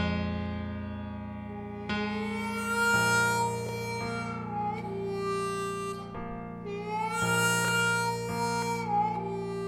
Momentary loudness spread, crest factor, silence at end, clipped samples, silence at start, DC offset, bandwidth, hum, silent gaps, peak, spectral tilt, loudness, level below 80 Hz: 13 LU; 18 dB; 0 s; under 0.1%; 0 s; under 0.1%; 18 kHz; none; none; -14 dBFS; -4.5 dB/octave; -30 LUFS; -54 dBFS